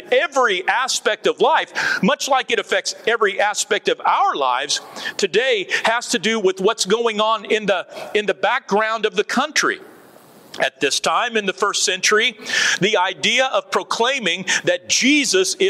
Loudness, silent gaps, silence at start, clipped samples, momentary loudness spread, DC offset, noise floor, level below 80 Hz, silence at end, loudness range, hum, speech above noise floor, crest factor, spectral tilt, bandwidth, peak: -18 LUFS; none; 0 s; under 0.1%; 5 LU; under 0.1%; -46 dBFS; -70 dBFS; 0 s; 3 LU; none; 27 dB; 16 dB; -2 dB/octave; 15.5 kHz; -4 dBFS